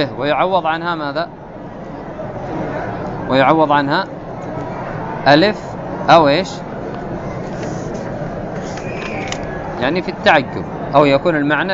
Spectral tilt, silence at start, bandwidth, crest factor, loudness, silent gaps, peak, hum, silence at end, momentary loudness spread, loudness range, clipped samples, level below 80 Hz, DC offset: -6 dB/octave; 0 s; 8 kHz; 18 dB; -17 LUFS; none; 0 dBFS; none; 0 s; 15 LU; 8 LU; under 0.1%; -40 dBFS; under 0.1%